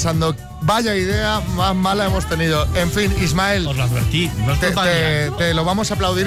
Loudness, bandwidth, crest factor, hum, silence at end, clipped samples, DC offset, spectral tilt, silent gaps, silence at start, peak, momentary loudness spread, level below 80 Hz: -18 LUFS; 16 kHz; 10 dB; none; 0 s; under 0.1%; under 0.1%; -5 dB/octave; none; 0 s; -8 dBFS; 3 LU; -30 dBFS